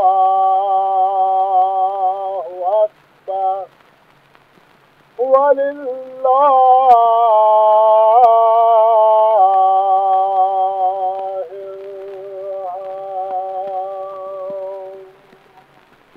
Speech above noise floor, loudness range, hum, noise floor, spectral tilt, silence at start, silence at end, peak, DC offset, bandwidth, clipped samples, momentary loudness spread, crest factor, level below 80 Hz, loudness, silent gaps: 37 dB; 15 LU; none; -51 dBFS; -5.5 dB/octave; 0 s; 1.1 s; 0 dBFS; under 0.1%; 4.3 kHz; under 0.1%; 17 LU; 14 dB; -70 dBFS; -14 LUFS; none